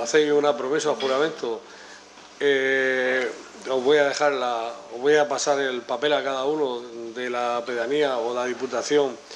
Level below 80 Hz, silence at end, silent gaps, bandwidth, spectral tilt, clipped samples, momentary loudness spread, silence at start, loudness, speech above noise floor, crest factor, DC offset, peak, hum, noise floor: -74 dBFS; 0 s; none; 10.5 kHz; -3 dB/octave; under 0.1%; 11 LU; 0 s; -23 LUFS; 22 dB; 18 dB; under 0.1%; -6 dBFS; 50 Hz at -65 dBFS; -46 dBFS